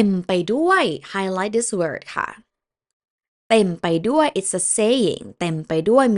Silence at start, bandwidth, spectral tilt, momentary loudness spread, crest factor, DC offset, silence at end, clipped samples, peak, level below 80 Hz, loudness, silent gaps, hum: 0 s; 11.5 kHz; -4 dB/octave; 9 LU; 20 dB; under 0.1%; 0 s; under 0.1%; -2 dBFS; -60 dBFS; -20 LUFS; 2.93-3.00 s, 3.10-3.18 s, 3.28-3.50 s; none